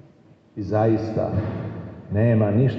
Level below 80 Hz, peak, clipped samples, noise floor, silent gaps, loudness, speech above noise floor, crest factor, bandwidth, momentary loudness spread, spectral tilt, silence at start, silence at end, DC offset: -52 dBFS; -8 dBFS; under 0.1%; -53 dBFS; none; -22 LUFS; 33 dB; 14 dB; 6 kHz; 15 LU; -10.5 dB/octave; 0.55 s; 0 s; under 0.1%